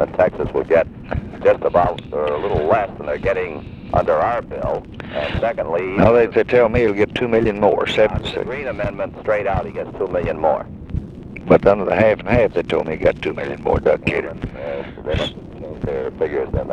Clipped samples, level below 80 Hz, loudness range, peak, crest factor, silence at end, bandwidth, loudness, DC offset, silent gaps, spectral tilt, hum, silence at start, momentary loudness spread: under 0.1%; -36 dBFS; 5 LU; 0 dBFS; 18 dB; 0 s; 8.8 kHz; -19 LUFS; under 0.1%; none; -7.5 dB/octave; none; 0 s; 13 LU